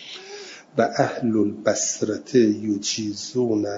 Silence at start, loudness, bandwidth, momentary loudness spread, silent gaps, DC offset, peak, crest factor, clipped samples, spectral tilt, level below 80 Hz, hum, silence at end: 0 s; -23 LUFS; 7.8 kHz; 14 LU; none; under 0.1%; -6 dBFS; 18 dB; under 0.1%; -4 dB/octave; -66 dBFS; none; 0 s